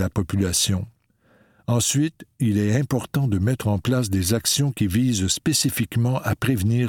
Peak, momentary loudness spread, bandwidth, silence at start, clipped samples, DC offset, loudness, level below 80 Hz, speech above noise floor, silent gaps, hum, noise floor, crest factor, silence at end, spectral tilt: -6 dBFS; 4 LU; 18.5 kHz; 0 s; under 0.1%; under 0.1%; -22 LUFS; -46 dBFS; 38 dB; none; none; -60 dBFS; 16 dB; 0 s; -4.5 dB/octave